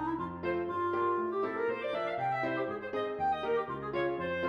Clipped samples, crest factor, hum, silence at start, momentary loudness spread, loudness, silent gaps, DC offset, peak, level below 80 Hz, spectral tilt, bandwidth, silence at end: under 0.1%; 12 dB; none; 0 s; 5 LU; -33 LUFS; none; under 0.1%; -20 dBFS; -64 dBFS; -7.5 dB/octave; 7 kHz; 0 s